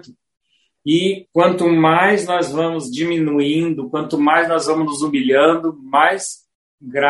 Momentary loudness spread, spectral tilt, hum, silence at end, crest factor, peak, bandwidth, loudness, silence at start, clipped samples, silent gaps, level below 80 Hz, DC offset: 8 LU; -5 dB/octave; none; 0 s; 16 dB; 0 dBFS; 11.5 kHz; -16 LUFS; 0.85 s; under 0.1%; 6.55-6.78 s; -62 dBFS; under 0.1%